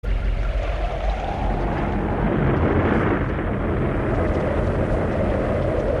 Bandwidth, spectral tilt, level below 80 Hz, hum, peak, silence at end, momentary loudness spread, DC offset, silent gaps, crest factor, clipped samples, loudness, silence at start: 7 kHz; -8.5 dB/octave; -26 dBFS; none; -8 dBFS; 0 s; 6 LU; under 0.1%; none; 14 dB; under 0.1%; -23 LUFS; 0.05 s